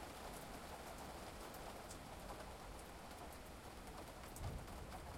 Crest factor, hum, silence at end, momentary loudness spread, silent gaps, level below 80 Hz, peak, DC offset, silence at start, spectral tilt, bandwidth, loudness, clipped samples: 16 dB; none; 0 s; 4 LU; none; -60 dBFS; -36 dBFS; under 0.1%; 0 s; -4 dB/octave; 16.5 kHz; -53 LUFS; under 0.1%